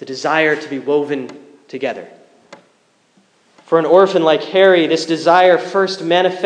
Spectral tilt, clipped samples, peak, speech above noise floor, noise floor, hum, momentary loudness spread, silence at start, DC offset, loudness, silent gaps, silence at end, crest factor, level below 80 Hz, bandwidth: -5 dB/octave; under 0.1%; 0 dBFS; 43 dB; -57 dBFS; none; 13 LU; 0 s; under 0.1%; -14 LUFS; none; 0 s; 16 dB; -72 dBFS; 9.8 kHz